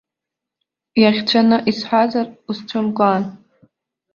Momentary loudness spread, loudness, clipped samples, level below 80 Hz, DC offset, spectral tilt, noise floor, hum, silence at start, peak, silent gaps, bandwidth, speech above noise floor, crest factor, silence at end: 11 LU; -17 LUFS; under 0.1%; -62 dBFS; under 0.1%; -6.5 dB/octave; -84 dBFS; none; 0.95 s; -2 dBFS; none; 7 kHz; 68 dB; 18 dB; 0.8 s